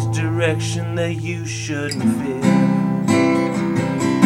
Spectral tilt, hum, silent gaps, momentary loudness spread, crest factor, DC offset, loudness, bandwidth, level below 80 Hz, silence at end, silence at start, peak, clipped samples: -6 dB/octave; none; none; 8 LU; 18 dB; under 0.1%; -19 LUFS; 15.5 kHz; -50 dBFS; 0 s; 0 s; 0 dBFS; under 0.1%